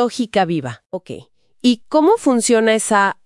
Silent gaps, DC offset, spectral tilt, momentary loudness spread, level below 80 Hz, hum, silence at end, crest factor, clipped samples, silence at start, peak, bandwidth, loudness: 0.86-0.90 s; under 0.1%; -4 dB/octave; 16 LU; -60 dBFS; none; 0.15 s; 14 dB; under 0.1%; 0 s; -2 dBFS; 12 kHz; -16 LUFS